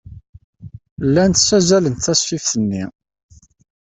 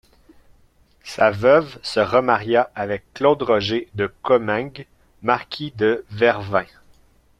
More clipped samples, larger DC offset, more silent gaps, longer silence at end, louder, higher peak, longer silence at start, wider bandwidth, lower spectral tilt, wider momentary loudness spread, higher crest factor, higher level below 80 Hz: neither; neither; first, 0.29-0.33 s, 0.44-0.53 s, 0.91-0.97 s vs none; first, 1.1 s vs 0.75 s; first, -16 LUFS vs -20 LUFS; about the same, -2 dBFS vs -2 dBFS; second, 0.05 s vs 1.05 s; second, 8.4 kHz vs 11 kHz; second, -4 dB/octave vs -6 dB/octave; about the same, 13 LU vs 11 LU; about the same, 16 dB vs 20 dB; first, -46 dBFS vs -54 dBFS